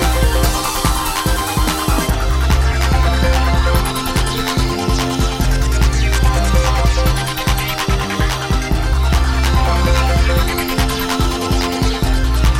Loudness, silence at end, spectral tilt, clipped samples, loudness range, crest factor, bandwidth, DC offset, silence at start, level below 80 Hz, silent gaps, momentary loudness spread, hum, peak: -16 LUFS; 0 s; -4.5 dB/octave; under 0.1%; 1 LU; 12 dB; 16.5 kHz; under 0.1%; 0 s; -16 dBFS; none; 3 LU; none; -2 dBFS